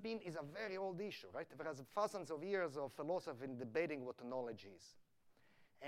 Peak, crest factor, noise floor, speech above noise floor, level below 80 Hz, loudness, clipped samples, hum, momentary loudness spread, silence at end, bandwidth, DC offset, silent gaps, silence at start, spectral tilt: -26 dBFS; 20 dB; -72 dBFS; 26 dB; -88 dBFS; -46 LUFS; under 0.1%; none; 9 LU; 0 s; 16 kHz; under 0.1%; none; 0 s; -5.5 dB/octave